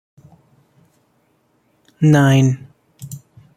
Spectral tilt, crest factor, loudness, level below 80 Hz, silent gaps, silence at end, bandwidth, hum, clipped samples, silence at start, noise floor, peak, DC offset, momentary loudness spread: -7 dB/octave; 18 dB; -15 LUFS; -56 dBFS; none; 0.4 s; 15 kHz; none; under 0.1%; 2 s; -61 dBFS; -2 dBFS; under 0.1%; 25 LU